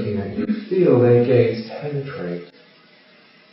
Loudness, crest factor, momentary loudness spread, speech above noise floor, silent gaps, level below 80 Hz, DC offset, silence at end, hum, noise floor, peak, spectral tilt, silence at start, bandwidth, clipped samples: -19 LUFS; 18 dB; 15 LU; 35 dB; none; -60 dBFS; under 0.1%; 1.05 s; none; -51 dBFS; -2 dBFS; -8 dB/octave; 0 s; 5.8 kHz; under 0.1%